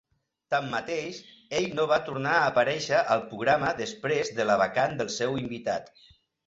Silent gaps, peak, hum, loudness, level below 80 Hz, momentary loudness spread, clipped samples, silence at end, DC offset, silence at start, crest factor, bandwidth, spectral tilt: none; -10 dBFS; none; -27 LUFS; -64 dBFS; 8 LU; under 0.1%; 0.6 s; under 0.1%; 0.5 s; 18 dB; 8 kHz; -4 dB/octave